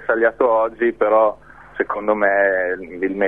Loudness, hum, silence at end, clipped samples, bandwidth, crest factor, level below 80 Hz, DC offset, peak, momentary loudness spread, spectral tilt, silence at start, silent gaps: -18 LUFS; none; 0 s; under 0.1%; 3.9 kHz; 16 dB; -54 dBFS; 0.2%; -2 dBFS; 9 LU; -8 dB/octave; 0 s; none